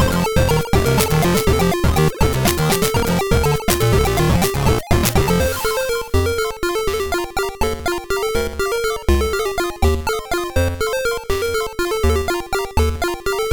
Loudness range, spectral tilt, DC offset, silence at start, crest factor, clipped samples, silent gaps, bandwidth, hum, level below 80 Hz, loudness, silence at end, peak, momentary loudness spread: 4 LU; -5 dB/octave; under 0.1%; 0 s; 16 dB; under 0.1%; none; 19.5 kHz; none; -26 dBFS; -18 LUFS; 0 s; -2 dBFS; 5 LU